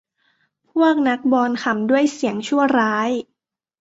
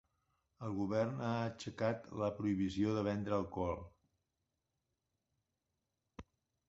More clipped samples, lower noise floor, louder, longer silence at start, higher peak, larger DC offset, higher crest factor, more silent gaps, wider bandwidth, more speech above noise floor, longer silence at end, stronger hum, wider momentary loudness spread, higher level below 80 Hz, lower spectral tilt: neither; second, -79 dBFS vs -88 dBFS; first, -19 LUFS vs -39 LUFS; first, 0.75 s vs 0.6 s; first, -4 dBFS vs -20 dBFS; neither; about the same, 16 dB vs 20 dB; neither; about the same, 8 kHz vs 7.6 kHz; first, 61 dB vs 50 dB; first, 0.6 s vs 0.45 s; neither; second, 7 LU vs 15 LU; about the same, -66 dBFS vs -62 dBFS; second, -5 dB/octave vs -6.5 dB/octave